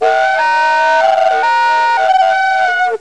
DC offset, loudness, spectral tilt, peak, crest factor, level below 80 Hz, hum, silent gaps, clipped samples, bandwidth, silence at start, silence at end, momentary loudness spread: 0.8%; -11 LUFS; -0.5 dB/octave; -2 dBFS; 10 dB; -62 dBFS; none; none; under 0.1%; 10.5 kHz; 0 s; 0.05 s; 2 LU